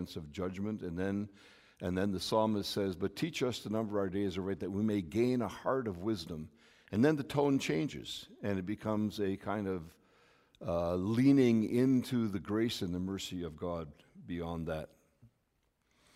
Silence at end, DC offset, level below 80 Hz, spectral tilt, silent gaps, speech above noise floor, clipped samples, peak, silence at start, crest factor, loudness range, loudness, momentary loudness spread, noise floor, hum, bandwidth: 0.9 s; under 0.1%; -62 dBFS; -6.5 dB/octave; none; 44 dB; under 0.1%; -16 dBFS; 0 s; 20 dB; 6 LU; -34 LUFS; 13 LU; -78 dBFS; none; 15.5 kHz